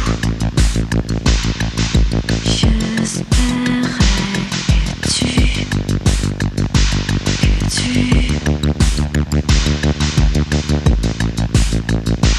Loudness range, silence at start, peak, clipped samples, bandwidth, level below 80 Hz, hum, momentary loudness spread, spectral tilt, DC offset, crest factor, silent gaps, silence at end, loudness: 1 LU; 0 s; 0 dBFS; under 0.1%; 13 kHz; -18 dBFS; none; 4 LU; -5 dB/octave; under 0.1%; 14 dB; none; 0 s; -16 LUFS